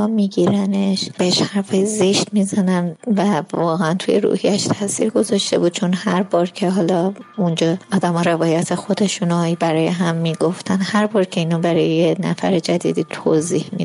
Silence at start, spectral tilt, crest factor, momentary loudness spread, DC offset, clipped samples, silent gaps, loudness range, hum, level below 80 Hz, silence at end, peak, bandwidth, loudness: 0 s; -5.5 dB/octave; 12 dB; 3 LU; under 0.1%; under 0.1%; none; 1 LU; none; -68 dBFS; 0 s; -6 dBFS; 12 kHz; -18 LUFS